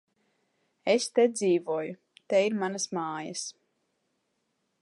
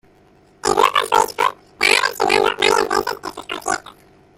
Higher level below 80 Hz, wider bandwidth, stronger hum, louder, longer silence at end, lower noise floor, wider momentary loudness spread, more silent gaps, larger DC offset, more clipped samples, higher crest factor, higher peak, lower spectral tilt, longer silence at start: second, -84 dBFS vs -52 dBFS; second, 11.5 kHz vs 17 kHz; neither; second, -28 LUFS vs -17 LUFS; first, 1.3 s vs 0.6 s; first, -77 dBFS vs -52 dBFS; about the same, 13 LU vs 11 LU; neither; neither; neither; about the same, 18 dB vs 18 dB; second, -12 dBFS vs -2 dBFS; first, -4 dB/octave vs -1.5 dB/octave; first, 0.85 s vs 0.65 s